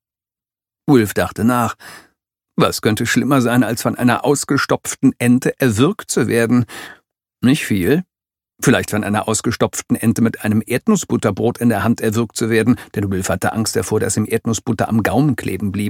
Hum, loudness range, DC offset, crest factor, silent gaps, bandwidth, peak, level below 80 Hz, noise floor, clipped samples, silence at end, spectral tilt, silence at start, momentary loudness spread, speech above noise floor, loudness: none; 2 LU; under 0.1%; 16 dB; none; 17 kHz; 0 dBFS; -50 dBFS; under -90 dBFS; under 0.1%; 0 s; -5.5 dB/octave; 0.85 s; 5 LU; over 74 dB; -17 LUFS